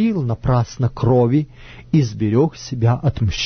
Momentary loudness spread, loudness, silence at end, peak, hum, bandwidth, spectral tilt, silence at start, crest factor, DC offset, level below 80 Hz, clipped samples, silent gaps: 5 LU; -18 LUFS; 0 s; -4 dBFS; none; 6.6 kHz; -7.5 dB/octave; 0 s; 14 dB; under 0.1%; -36 dBFS; under 0.1%; none